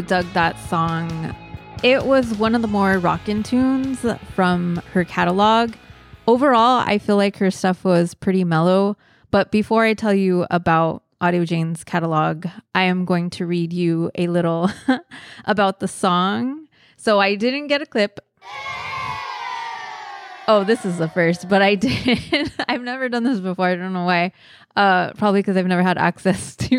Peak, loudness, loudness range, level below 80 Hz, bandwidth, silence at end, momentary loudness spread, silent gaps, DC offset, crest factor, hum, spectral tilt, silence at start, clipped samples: -4 dBFS; -19 LUFS; 4 LU; -50 dBFS; 12.5 kHz; 0 s; 10 LU; none; under 0.1%; 16 dB; none; -6 dB/octave; 0 s; under 0.1%